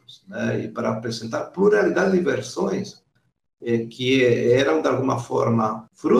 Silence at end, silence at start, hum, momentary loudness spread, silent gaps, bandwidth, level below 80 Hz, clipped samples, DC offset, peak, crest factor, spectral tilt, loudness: 0 s; 0.1 s; none; 10 LU; none; 11.5 kHz; -62 dBFS; under 0.1%; under 0.1%; -6 dBFS; 16 dB; -6 dB/octave; -22 LUFS